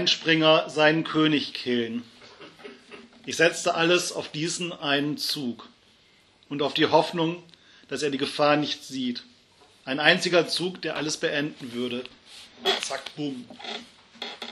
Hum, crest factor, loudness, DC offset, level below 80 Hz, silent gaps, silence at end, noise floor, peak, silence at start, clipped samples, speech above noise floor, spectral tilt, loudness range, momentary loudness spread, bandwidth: none; 24 dB; -25 LUFS; under 0.1%; -74 dBFS; none; 0 s; -59 dBFS; -2 dBFS; 0 s; under 0.1%; 34 dB; -3.5 dB/octave; 4 LU; 18 LU; 13.5 kHz